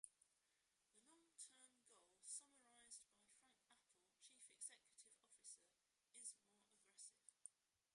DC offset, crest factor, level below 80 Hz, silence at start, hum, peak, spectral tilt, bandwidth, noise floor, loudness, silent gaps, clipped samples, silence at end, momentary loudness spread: under 0.1%; 28 dB; under -90 dBFS; 0.05 s; none; -38 dBFS; 1.5 dB/octave; 11.5 kHz; -88 dBFS; -61 LUFS; none; under 0.1%; 0.4 s; 11 LU